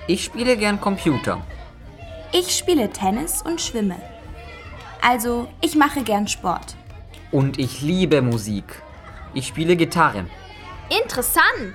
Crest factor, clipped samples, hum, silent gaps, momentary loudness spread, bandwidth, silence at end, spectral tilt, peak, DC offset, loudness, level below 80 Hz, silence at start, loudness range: 20 dB; under 0.1%; none; none; 21 LU; 17 kHz; 0 s; -4 dB/octave; -2 dBFS; under 0.1%; -20 LUFS; -42 dBFS; 0 s; 2 LU